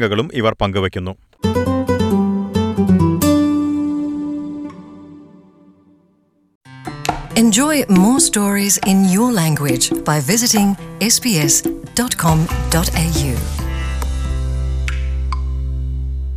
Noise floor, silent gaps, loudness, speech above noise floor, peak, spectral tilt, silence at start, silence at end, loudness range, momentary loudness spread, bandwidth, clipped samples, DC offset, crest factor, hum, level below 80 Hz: -58 dBFS; 6.55-6.61 s; -16 LUFS; 43 dB; -2 dBFS; -4.5 dB/octave; 0 s; 0 s; 8 LU; 11 LU; 16 kHz; under 0.1%; under 0.1%; 14 dB; none; -26 dBFS